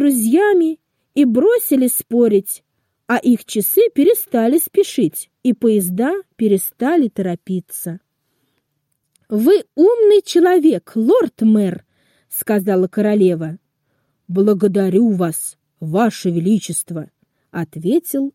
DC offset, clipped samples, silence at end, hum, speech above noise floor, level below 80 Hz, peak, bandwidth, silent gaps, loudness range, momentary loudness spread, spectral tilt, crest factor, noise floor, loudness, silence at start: under 0.1%; under 0.1%; 0.05 s; none; 56 dB; -66 dBFS; -4 dBFS; 16.5 kHz; none; 5 LU; 13 LU; -5.5 dB/octave; 12 dB; -71 dBFS; -16 LUFS; 0 s